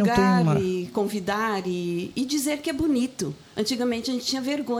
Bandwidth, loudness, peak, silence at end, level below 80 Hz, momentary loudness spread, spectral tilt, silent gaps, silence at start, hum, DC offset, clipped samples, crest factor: 19 kHz; -25 LUFS; -8 dBFS; 0 s; -52 dBFS; 9 LU; -5 dB/octave; none; 0 s; none; under 0.1%; under 0.1%; 18 dB